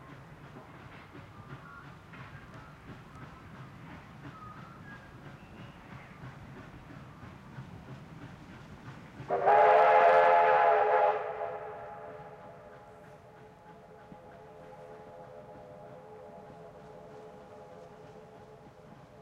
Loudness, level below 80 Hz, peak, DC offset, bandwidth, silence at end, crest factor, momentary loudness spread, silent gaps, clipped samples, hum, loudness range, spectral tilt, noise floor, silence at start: -25 LUFS; -64 dBFS; -12 dBFS; under 0.1%; 9 kHz; 1.6 s; 20 dB; 28 LU; none; under 0.1%; none; 25 LU; -6 dB/octave; -54 dBFS; 0.55 s